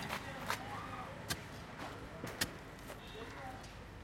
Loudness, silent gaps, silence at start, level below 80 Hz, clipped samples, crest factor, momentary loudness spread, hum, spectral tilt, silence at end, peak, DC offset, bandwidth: -44 LUFS; none; 0 s; -60 dBFS; under 0.1%; 26 dB; 9 LU; none; -3.5 dB/octave; 0 s; -18 dBFS; under 0.1%; 16.5 kHz